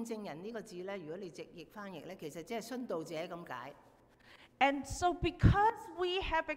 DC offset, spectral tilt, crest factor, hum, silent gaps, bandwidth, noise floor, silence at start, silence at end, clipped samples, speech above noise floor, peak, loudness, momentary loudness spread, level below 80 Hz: under 0.1%; -5.5 dB/octave; 24 dB; none; none; 16 kHz; -62 dBFS; 0 s; 0 s; under 0.1%; 26 dB; -14 dBFS; -36 LUFS; 17 LU; -48 dBFS